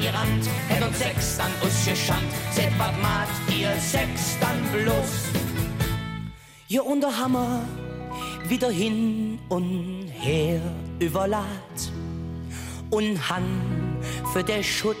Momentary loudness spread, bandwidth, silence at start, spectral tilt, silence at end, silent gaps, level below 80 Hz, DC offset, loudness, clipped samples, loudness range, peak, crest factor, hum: 10 LU; 16.5 kHz; 0 s; -4.5 dB/octave; 0 s; none; -42 dBFS; under 0.1%; -26 LUFS; under 0.1%; 4 LU; -10 dBFS; 16 dB; none